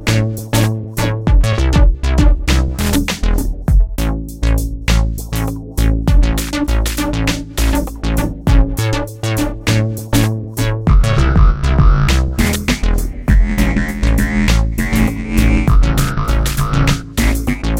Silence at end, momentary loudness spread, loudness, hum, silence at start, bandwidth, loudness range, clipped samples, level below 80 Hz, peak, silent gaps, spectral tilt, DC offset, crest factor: 0 s; 6 LU; -16 LUFS; none; 0 s; 16.5 kHz; 3 LU; under 0.1%; -16 dBFS; 0 dBFS; none; -5.5 dB/octave; under 0.1%; 14 dB